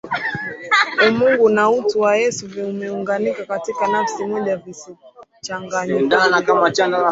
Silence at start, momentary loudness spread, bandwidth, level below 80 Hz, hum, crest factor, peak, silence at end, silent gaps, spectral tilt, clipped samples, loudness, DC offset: 0.05 s; 13 LU; 8 kHz; -62 dBFS; none; 18 dB; 0 dBFS; 0 s; none; -4 dB/octave; under 0.1%; -18 LUFS; under 0.1%